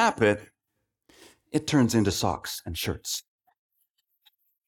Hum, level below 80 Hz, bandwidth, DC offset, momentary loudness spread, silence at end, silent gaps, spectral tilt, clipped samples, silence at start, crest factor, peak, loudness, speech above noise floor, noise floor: none; -56 dBFS; 19 kHz; under 0.1%; 11 LU; 1.45 s; none; -4.5 dB/octave; under 0.1%; 0 s; 22 dB; -8 dBFS; -27 LUFS; 55 dB; -81 dBFS